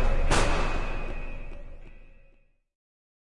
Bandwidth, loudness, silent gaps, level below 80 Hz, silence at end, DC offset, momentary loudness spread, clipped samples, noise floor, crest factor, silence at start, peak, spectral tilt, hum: 11.5 kHz; -29 LUFS; none; -30 dBFS; 0.6 s; under 0.1%; 23 LU; under 0.1%; -60 dBFS; 18 dB; 0 s; -10 dBFS; -4 dB/octave; none